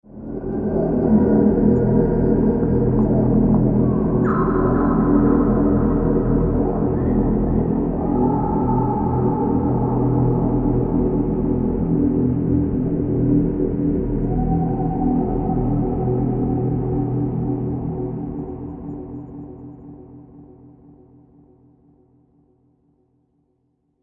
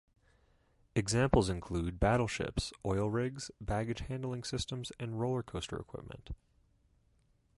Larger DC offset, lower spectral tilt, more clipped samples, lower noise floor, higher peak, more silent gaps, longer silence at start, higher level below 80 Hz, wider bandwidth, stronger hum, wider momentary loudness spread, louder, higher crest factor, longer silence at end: neither; first, -14 dB/octave vs -5.5 dB/octave; neither; second, -67 dBFS vs -71 dBFS; first, -4 dBFS vs -12 dBFS; neither; second, 0.1 s vs 0.95 s; first, -30 dBFS vs -48 dBFS; second, 2.8 kHz vs 11.5 kHz; neither; second, 11 LU vs 14 LU; first, -19 LUFS vs -35 LUFS; second, 16 dB vs 24 dB; first, 3.5 s vs 1.25 s